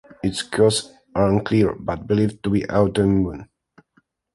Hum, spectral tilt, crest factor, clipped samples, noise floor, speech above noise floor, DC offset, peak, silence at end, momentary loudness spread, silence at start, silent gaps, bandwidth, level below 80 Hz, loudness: none; -6 dB/octave; 18 dB; under 0.1%; -64 dBFS; 44 dB; under 0.1%; -4 dBFS; 0.9 s; 9 LU; 0.25 s; none; 11.5 kHz; -42 dBFS; -21 LUFS